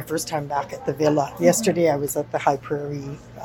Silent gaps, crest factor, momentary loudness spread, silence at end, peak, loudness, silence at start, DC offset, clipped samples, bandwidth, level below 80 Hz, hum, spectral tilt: none; 20 dB; 10 LU; 0 s; -4 dBFS; -22 LUFS; 0 s; under 0.1%; under 0.1%; 18 kHz; -54 dBFS; none; -5 dB/octave